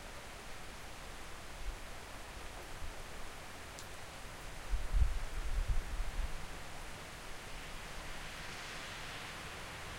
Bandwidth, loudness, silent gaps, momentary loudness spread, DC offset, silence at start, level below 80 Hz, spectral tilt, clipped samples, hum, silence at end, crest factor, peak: 16 kHz; -45 LUFS; none; 8 LU; under 0.1%; 0 s; -42 dBFS; -3.5 dB/octave; under 0.1%; none; 0 s; 22 dB; -18 dBFS